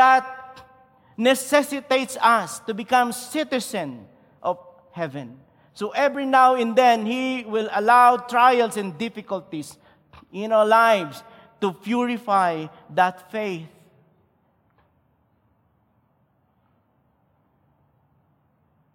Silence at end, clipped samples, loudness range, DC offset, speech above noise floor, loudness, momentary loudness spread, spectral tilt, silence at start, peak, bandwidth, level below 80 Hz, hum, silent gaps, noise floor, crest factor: 5.25 s; under 0.1%; 9 LU; under 0.1%; 45 dB; -21 LUFS; 18 LU; -4 dB/octave; 0 s; -4 dBFS; 16.5 kHz; -70 dBFS; none; none; -65 dBFS; 18 dB